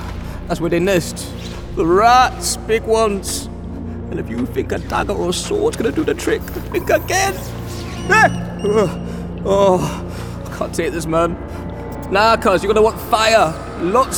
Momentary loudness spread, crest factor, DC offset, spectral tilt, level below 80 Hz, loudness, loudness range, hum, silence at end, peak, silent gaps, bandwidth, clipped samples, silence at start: 15 LU; 16 dB; under 0.1%; -4.5 dB/octave; -34 dBFS; -17 LUFS; 4 LU; none; 0 s; 0 dBFS; none; over 20 kHz; under 0.1%; 0 s